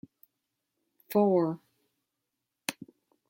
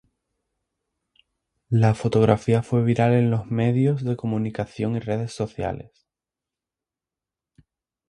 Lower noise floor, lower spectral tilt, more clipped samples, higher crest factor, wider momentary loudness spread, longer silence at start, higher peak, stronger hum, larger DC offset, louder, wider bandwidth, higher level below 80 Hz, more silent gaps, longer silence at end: second, -85 dBFS vs -89 dBFS; second, -6 dB/octave vs -8.5 dB/octave; neither; about the same, 22 dB vs 22 dB; first, 17 LU vs 9 LU; second, 1.1 s vs 1.7 s; second, -10 dBFS vs -2 dBFS; neither; neither; second, -29 LUFS vs -22 LUFS; first, 16.5 kHz vs 10.5 kHz; second, -80 dBFS vs -52 dBFS; neither; second, 0.6 s vs 2.25 s